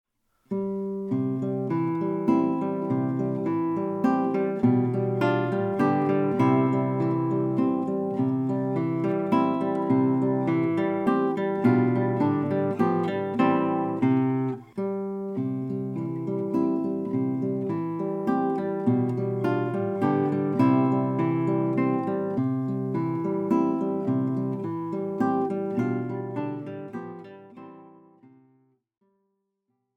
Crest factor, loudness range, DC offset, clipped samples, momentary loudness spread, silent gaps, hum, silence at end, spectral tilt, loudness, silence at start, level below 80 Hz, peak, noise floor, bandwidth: 16 dB; 5 LU; under 0.1%; under 0.1%; 8 LU; none; none; 2.1 s; -10 dB/octave; -26 LUFS; 0.5 s; -72 dBFS; -10 dBFS; -78 dBFS; 5.6 kHz